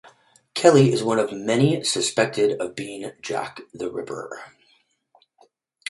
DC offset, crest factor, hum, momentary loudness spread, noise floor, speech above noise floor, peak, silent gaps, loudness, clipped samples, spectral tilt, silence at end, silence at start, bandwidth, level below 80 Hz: under 0.1%; 22 dB; none; 17 LU; -63 dBFS; 42 dB; 0 dBFS; none; -22 LUFS; under 0.1%; -5 dB/octave; 1.4 s; 0.55 s; 11.5 kHz; -64 dBFS